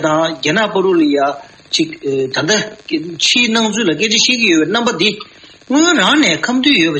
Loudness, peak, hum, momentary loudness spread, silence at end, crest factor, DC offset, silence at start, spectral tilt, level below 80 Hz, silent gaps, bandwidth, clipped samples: -13 LUFS; 0 dBFS; none; 9 LU; 0 s; 14 dB; under 0.1%; 0 s; -3 dB/octave; -56 dBFS; none; 8.8 kHz; under 0.1%